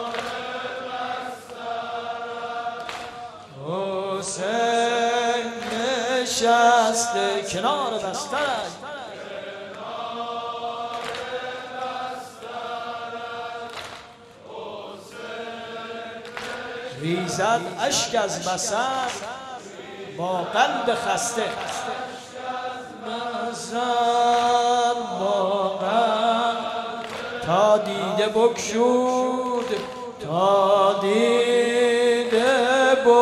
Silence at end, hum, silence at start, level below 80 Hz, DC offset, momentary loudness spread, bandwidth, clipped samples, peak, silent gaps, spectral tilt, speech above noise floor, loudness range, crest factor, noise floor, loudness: 0 s; none; 0 s; -64 dBFS; under 0.1%; 16 LU; 13.5 kHz; under 0.1%; -4 dBFS; none; -3 dB/octave; 23 dB; 11 LU; 18 dB; -45 dBFS; -23 LUFS